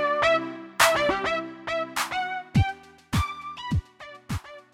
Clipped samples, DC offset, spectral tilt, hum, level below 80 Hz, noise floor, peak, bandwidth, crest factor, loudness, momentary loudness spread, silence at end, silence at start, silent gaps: under 0.1%; under 0.1%; -4 dB/octave; none; -42 dBFS; -46 dBFS; -6 dBFS; 17 kHz; 20 dB; -26 LUFS; 14 LU; 0.15 s; 0 s; none